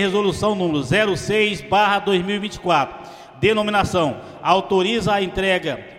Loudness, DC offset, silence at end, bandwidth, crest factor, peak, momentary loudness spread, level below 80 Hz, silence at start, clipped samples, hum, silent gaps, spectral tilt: -19 LUFS; under 0.1%; 0 s; 14 kHz; 18 dB; 0 dBFS; 7 LU; -44 dBFS; 0 s; under 0.1%; none; none; -5 dB/octave